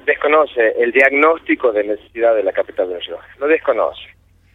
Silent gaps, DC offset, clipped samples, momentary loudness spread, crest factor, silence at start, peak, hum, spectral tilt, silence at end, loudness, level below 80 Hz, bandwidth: none; under 0.1%; under 0.1%; 11 LU; 16 dB; 0.05 s; 0 dBFS; none; -5 dB/octave; 0.5 s; -15 LUFS; -54 dBFS; 4.6 kHz